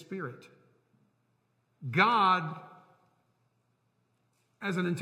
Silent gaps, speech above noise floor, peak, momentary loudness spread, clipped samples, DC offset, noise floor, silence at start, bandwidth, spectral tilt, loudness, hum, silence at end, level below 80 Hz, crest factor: none; 46 dB; -10 dBFS; 20 LU; under 0.1%; under 0.1%; -75 dBFS; 0 s; 12 kHz; -6 dB/octave; -28 LUFS; none; 0 s; -82 dBFS; 24 dB